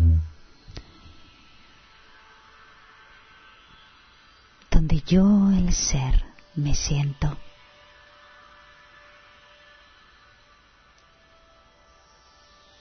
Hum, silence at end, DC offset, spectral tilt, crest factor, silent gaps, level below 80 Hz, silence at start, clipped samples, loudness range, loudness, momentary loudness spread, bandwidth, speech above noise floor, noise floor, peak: none; 5.3 s; under 0.1%; -5.5 dB/octave; 20 dB; none; -30 dBFS; 0 s; under 0.1%; 12 LU; -23 LUFS; 25 LU; 6.6 kHz; 36 dB; -56 dBFS; -6 dBFS